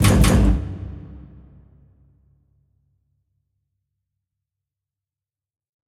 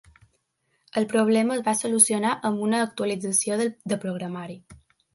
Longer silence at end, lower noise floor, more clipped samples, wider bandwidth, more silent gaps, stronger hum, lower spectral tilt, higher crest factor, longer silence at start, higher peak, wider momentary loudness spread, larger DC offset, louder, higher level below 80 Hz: first, 4.7 s vs 0.4 s; first, under -90 dBFS vs -73 dBFS; neither; first, 16 kHz vs 11.5 kHz; neither; neither; first, -5.5 dB/octave vs -3.5 dB/octave; about the same, 22 dB vs 22 dB; second, 0 s vs 0.95 s; about the same, -2 dBFS vs -2 dBFS; first, 26 LU vs 14 LU; neither; first, -18 LUFS vs -23 LUFS; first, -28 dBFS vs -66 dBFS